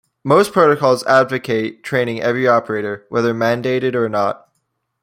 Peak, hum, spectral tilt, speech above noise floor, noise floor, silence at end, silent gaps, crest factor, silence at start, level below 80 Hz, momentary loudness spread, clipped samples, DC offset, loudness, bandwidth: -2 dBFS; none; -6 dB/octave; 54 dB; -70 dBFS; 0.65 s; none; 16 dB; 0.25 s; -60 dBFS; 8 LU; under 0.1%; under 0.1%; -16 LUFS; 16 kHz